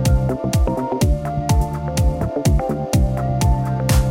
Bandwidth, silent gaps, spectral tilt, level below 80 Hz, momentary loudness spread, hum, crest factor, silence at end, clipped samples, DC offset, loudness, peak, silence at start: 16.5 kHz; none; -6.5 dB/octave; -22 dBFS; 2 LU; none; 14 dB; 0 s; under 0.1%; under 0.1%; -19 LUFS; -4 dBFS; 0 s